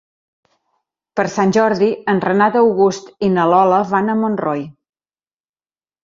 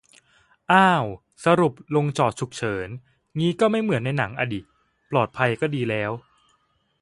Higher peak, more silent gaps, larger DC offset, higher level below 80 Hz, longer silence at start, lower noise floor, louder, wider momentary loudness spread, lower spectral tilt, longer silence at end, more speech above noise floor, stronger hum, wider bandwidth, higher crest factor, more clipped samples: about the same, 0 dBFS vs -2 dBFS; neither; neither; about the same, -58 dBFS vs -58 dBFS; first, 1.15 s vs 0.7 s; first, under -90 dBFS vs -67 dBFS; first, -16 LUFS vs -23 LUFS; second, 9 LU vs 13 LU; about the same, -6.5 dB/octave vs -6 dB/octave; first, 1.3 s vs 0.85 s; first, over 75 dB vs 45 dB; neither; second, 7.6 kHz vs 11.5 kHz; second, 16 dB vs 22 dB; neither